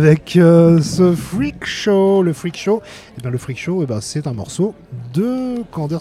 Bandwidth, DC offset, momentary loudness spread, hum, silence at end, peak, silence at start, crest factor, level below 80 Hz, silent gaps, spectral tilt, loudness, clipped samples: 13.5 kHz; under 0.1%; 14 LU; none; 0 s; 0 dBFS; 0 s; 14 dB; -46 dBFS; none; -7 dB/octave; -16 LUFS; under 0.1%